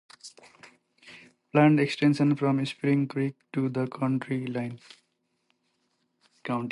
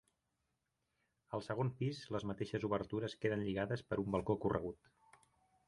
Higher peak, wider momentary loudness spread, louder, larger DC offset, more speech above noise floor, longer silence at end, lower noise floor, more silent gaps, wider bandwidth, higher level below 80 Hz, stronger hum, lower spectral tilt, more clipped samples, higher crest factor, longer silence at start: first, -10 dBFS vs -20 dBFS; first, 20 LU vs 7 LU; first, -26 LUFS vs -40 LUFS; neither; about the same, 49 dB vs 46 dB; second, 0 s vs 0.95 s; second, -75 dBFS vs -86 dBFS; neither; about the same, 11.5 kHz vs 11.5 kHz; second, -76 dBFS vs -64 dBFS; neither; about the same, -7.5 dB/octave vs -7.5 dB/octave; neither; about the same, 18 dB vs 22 dB; second, 0.25 s vs 1.3 s